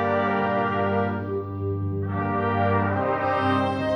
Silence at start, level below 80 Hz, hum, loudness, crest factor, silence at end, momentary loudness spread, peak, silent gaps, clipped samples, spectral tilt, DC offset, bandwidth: 0 s; -56 dBFS; 50 Hz at -45 dBFS; -24 LUFS; 14 dB; 0 s; 6 LU; -10 dBFS; none; under 0.1%; -8.5 dB/octave; under 0.1%; 8.8 kHz